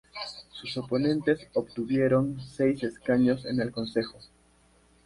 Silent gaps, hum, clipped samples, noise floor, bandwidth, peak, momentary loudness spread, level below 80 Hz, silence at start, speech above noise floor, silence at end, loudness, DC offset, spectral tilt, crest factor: none; none; under 0.1%; -62 dBFS; 11.5 kHz; -12 dBFS; 14 LU; -60 dBFS; 0.15 s; 34 dB; 0.8 s; -28 LUFS; under 0.1%; -7 dB/octave; 16 dB